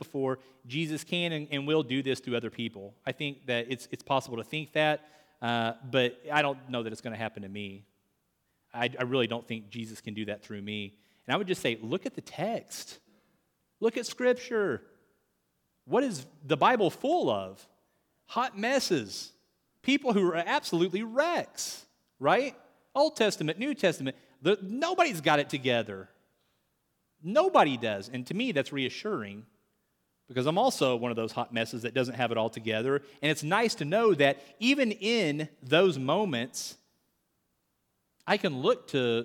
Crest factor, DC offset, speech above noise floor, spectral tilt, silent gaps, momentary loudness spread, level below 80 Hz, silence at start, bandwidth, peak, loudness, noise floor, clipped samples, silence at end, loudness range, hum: 20 dB; under 0.1%; 48 dB; -4.5 dB/octave; none; 13 LU; -78 dBFS; 0 s; 18.5 kHz; -10 dBFS; -30 LUFS; -77 dBFS; under 0.1%; 0 s; 7 LU; none